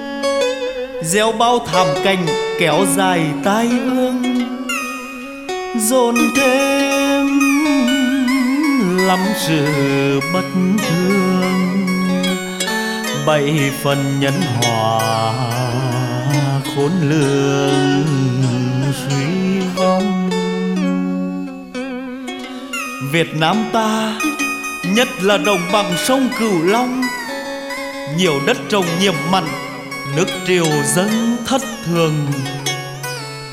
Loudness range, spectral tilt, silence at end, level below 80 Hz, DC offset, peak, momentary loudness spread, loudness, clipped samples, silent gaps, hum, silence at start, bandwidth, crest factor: 4 LU; -5 dB/octave; 0 s; -50 dBFS; under 0.1%; -2 dBFS; 9 LU; -17 LUFS; under 0.1%; none; none; 0 s; 16.5 kHz; 16 dB